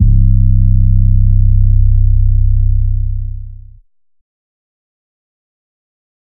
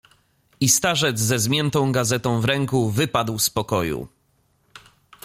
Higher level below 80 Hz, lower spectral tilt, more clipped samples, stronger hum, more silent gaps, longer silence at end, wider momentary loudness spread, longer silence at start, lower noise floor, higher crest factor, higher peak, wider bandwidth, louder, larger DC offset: first, -12 dBFS vs -52 dBFS; first, -19.5 dB/octave vs -3.5 dB/octave; neither; neither; neither; first, 2.65 s vs 0.45 s; first, 11 LU vs 6 LU; second, 0 s vs 0.6 s; second, -32 dBFS vs -64 dBFS; second, 10 dB vs 18 dB; first, 0 dBFS vs -4 dBFS; second, 0.4 kHz vs 16.5 kHz; first, -13 LUFS vs -20 LUFS; neither